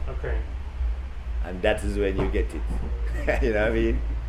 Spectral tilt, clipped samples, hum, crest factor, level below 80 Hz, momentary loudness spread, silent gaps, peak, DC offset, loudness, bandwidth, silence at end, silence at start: -7 dB/octave; under 0.1%; none; 18 dB; -28 dBFS; 9 LU; none; -8 dBFS; under 0.1%; -27 LUFS; 11 kHz; 0 s; 0 s